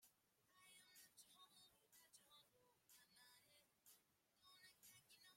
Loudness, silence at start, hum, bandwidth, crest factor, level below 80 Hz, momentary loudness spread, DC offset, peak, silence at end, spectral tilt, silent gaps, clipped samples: -68 LUFS; 0 s; none; 16.5 kHz; 20 dB; under -90 dBFS; 3 LU; under 0.1%; -54 dBFS; 0 s; 0 dB/octave; none; under 0.1%